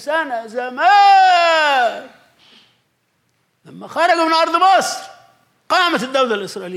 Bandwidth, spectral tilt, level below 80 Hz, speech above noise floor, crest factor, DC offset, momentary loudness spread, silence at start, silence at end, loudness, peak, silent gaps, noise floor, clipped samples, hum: 14 kHz; -2 dB/octave; -74 dBFS; 50 dB; 14 dB; under 0.1%; 14 LU; 0 s; 0 s; -14 LUFS; -4 dBFS; none; -65 dBFS; under 0.1%; none